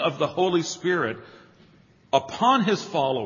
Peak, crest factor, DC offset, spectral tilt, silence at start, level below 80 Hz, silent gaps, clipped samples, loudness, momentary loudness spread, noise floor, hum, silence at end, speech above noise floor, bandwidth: -4 dBFS; 20 dB; under 0.1%; -4.5 dB/octave; 0 s; -68 dBFS; none; under 0.1%; -24 LUFS; 5 LU; -56 dBFS; none; 0 s; 32 dB; 7.4 kHz